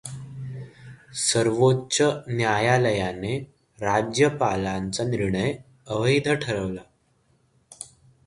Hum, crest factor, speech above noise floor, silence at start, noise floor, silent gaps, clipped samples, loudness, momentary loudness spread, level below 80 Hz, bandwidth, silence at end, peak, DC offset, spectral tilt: none; 20 dB; 42 dB; 0.05 s; -65 dBFS; none; under 0.1%; -24 LUFS; 18 LU; -52 dBFS; 11.5 kHz; 0.4 s; -6 dBFS; under 0.1%; -4.5 dB/octave